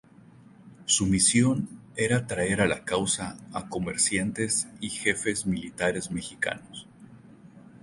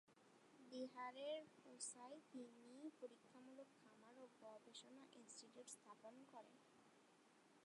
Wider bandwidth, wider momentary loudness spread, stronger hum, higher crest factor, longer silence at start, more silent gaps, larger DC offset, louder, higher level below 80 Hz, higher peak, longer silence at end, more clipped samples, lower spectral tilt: about the same, 11.5 kHz vs 11 kHz; about the same, 14 LU vs 13 LU; neither; about the same, 20 dB vs 20 dB; first, 0.6 s vs 0.05 s; neither; neither; first, -26 LUFS vs -59 LUFS; first, -52 dBFS vs under -90 dBFS; first, -8 dBFS vs -40 dBFS; about the same, 0.05 s vs 0 s; neither; first, -3.5 dB/octave vs -2 dB/octave